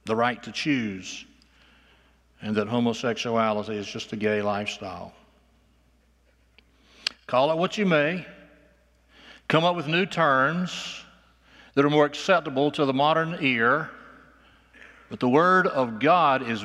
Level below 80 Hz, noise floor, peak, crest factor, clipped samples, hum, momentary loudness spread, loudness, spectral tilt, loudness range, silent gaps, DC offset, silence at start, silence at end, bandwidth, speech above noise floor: -64 dBFS; -62 dBFS; -4 dBFS; 20 dB; under 0.1%; none; 16 LU; -24 LUFS; -5.5 dB/octave; 7 LU; none; under 0.1%; 0.05 s; 0 s; 12.5 kHz; 39 dB